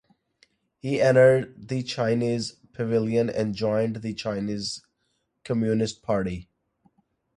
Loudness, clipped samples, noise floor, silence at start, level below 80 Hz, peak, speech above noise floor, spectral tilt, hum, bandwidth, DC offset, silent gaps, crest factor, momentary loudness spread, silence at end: -25 LUFS; under 0.1%; -74 dBFS; 0.85 s; -56 dBFS; -6 dBFS; 50 dB; -6 dB/octave; none; 11 kHz; under 0.1%; none; 20 dB; 14 LU; 0.95 s